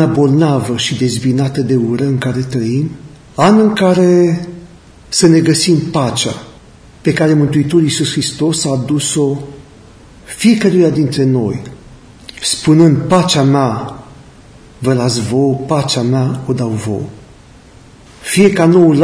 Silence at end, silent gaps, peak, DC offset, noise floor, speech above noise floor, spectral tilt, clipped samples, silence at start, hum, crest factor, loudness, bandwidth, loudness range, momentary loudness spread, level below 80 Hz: 0 s; none; 0 dBFS; under 0.1%; -39 dBFS; 28 dB; -5.5 dB/octave; under 0.1%; 0 s; none; 12 dB; -13 LUFS; 11 kHz; 4 LU; 14 LU; -44 dBFS